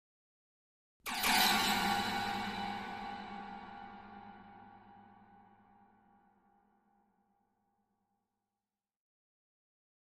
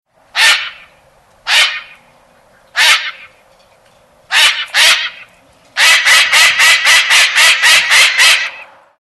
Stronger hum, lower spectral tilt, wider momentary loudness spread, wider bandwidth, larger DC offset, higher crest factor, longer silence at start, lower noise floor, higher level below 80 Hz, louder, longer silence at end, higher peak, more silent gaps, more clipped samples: neither; first, -2 dB/octave vs 4 dB/octave; first, 25 LU vs 16 LU; about the same, 15.5 kHz vs 14.5 kHz; neither; first, 24 dB vs 12 dB; first, 1.05 s vs 0.35 s; first, under -90 dBFS vs -48 dBFS; second, -66 dBFS vs -58 dBFS; second, -33 LUFS vs -7 LUFS; first, 4.7 s vs 0.35 s; second, -16 dBFS vs 0 dBFS; neither; neither